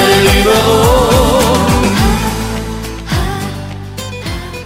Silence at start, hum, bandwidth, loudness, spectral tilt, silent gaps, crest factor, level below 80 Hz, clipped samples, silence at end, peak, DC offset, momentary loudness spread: 0 s; none; 16.5 kHz; -12 LUFS; -4.5 dB/octave; none; 12 dB; -20 dBFS; under 0.1%; 0 s; 0 dBFS; under 0.1%; 14 LU